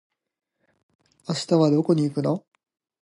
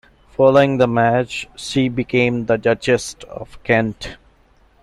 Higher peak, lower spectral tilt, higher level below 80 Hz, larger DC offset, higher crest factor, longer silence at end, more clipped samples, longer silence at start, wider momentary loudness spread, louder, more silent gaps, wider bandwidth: second, -8 dBFS vs -2 dBFS; first, -7 dB/octave vs -5.5 dB/octave; second, -72 dBFS vs -46 dBFS; neither; about the same, 18 dB vs 16 dB; about the same, 0.6 s vs 0.7 s; neither; first, 1.3 s vs 0.4 s; second, 11 LU vs 18 LU; second, -23 LUFS vs -17 LUFS; neither; about the same, 11.5 kHz vs 12.5 kHz